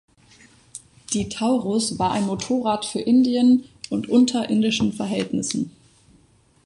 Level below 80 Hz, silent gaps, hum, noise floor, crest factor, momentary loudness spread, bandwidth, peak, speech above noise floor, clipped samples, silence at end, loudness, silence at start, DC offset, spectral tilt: -54 dBFS; none; none; -57 dBFS; 16 dB; 11 LU; 11.5 kHz; -6 dBFS; 37 dB; under 0.1%; 0.95 s; -21 LUFS; 0.75 s; under 0.1%; -4.5 dB/octave